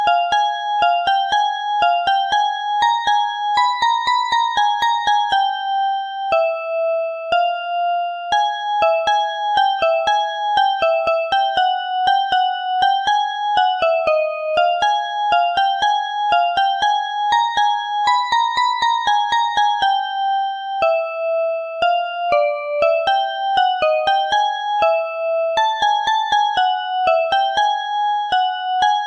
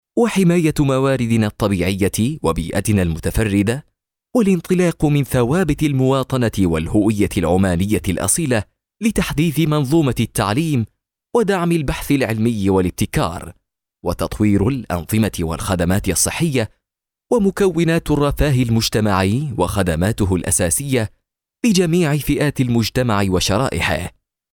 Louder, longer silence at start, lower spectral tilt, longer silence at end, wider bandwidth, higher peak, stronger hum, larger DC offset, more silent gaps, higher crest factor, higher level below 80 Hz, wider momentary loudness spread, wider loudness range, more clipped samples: about the same, -18 LUFS vs -18 LUFS; second, 0 s vs 0.15 s; second, -0.5 dB/octave vs -5.5 dB/octave; second, 0 s vs 0.45 s; second, 8.8 kHz vs 19 kHz; about the same, -6 dBFS vs -4 dBFS; neither; neither; neither; about the same, 12 dB vs 14 dB; second, -58 dBFS vs -34 dBFS; about the same, 4 LU vs 5 LU; about the same, 2 LU vs 2 LU; neither